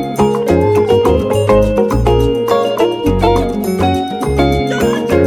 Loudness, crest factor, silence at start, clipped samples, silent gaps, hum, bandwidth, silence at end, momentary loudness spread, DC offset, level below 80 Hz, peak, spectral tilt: -13 LUFS; 12 dB; 0 s; under 0.1%; none; none; 17.5 kHz; 0 s; 4 LU; under 0.1%; -24 dBFS; 0 dBFS; -6.5 dB/octave